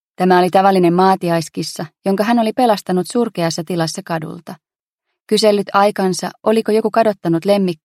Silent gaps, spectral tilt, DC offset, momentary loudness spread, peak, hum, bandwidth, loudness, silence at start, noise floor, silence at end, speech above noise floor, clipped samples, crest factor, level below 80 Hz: 4.80-4.96 s, 5.22-5.26 s; -5.5 dB/octave; under 0.1%; 11 LU; 0 dBFS; none; 15.5 kHz; -16 LUFS; 0.2 s; -77 dBFS; 0.1 s; 62 dB; under 0.1%; 16 dB; -64 dBFS